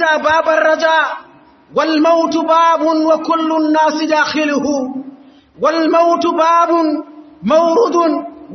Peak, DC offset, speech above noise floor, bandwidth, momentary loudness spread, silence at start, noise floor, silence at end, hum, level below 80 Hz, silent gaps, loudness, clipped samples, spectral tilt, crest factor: -2 dBFS; under 0.1%; 28 dB; 6.4 kHz; 9 LU; 0 s; -41 dBFS; 0 s; none; -60 dBFS; none; -13 LUFS; under 0.1%; -4 dB/octave; 12 dB